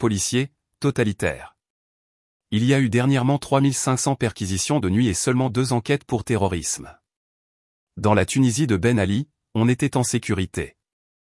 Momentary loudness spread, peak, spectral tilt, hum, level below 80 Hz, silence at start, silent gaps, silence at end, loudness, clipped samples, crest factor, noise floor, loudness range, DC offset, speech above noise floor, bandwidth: 8 LU; -4 dBFS; -5 dB/octave; none; -52 dBFS; 0 s; 1.70-2.40 s, 7.16-7.87 s; 0.55 s; -22 LUFS; under 0.1%; 18 dB; under -90 dBFS; 3 LU; under 0.1%; over 69 dB; 12 kHz